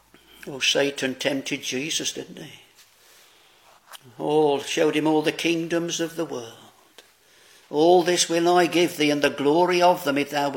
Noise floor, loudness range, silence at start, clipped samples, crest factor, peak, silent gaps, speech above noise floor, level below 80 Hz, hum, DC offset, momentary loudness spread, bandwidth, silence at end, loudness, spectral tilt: -56 dBFS; 8 LU; 0.45 s; under 0.1%; 18 dB; -4 dBFS; none; 33 dB; -70 dBFS; none; under 0.1%; 15 LU; 17 kHz; 0 s; -22 LUFS; -3.5 dB/octave